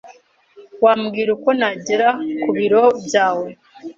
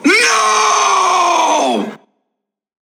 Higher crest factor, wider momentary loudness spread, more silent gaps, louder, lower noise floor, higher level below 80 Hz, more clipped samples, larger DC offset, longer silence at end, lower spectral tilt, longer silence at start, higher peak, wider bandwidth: about the same, 16 dB vs 14 dB; about the same, 8 LU vs 8 LU; neither; second, -17 LUFS vs -12 LUFS; second, -48 dBFS vs -76 dBFS; first, -64 dBFS vs -80 dBFS; neither; neither; second, 0.05 s vs 1 s; first, -4.5 dB/octave vs -1 dB/octave; about the same, 0.05 s vs 0 s; about the same, -2 dBFS vs 0 dBFS; second, 7.8 kHz vs 19.5 kHz